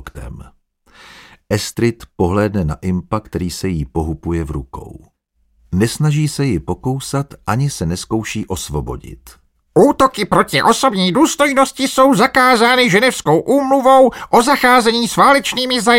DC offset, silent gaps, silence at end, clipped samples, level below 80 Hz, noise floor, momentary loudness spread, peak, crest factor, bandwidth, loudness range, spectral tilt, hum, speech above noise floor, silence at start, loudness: under 0.1%; none; 0 s; under 0.1%; -36 dBFS; -59 dBFS; 12 LU; 0 dBFS; 14 dB; 17 kHz; 9 LU; -4.5 dB/octave; none; 45 dB; 0.05 s; -14 LUFS